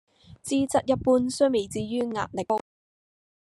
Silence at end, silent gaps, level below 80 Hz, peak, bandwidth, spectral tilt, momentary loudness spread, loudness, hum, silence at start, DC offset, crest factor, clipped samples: 0.9 s; none; -58 dBFS; -10 dBFS; 12.5 kHz; -5 dB/octave; 7 LU; -26 LUFS; none; 0.3 s; under 0.1%; 16 dB; under 0.1%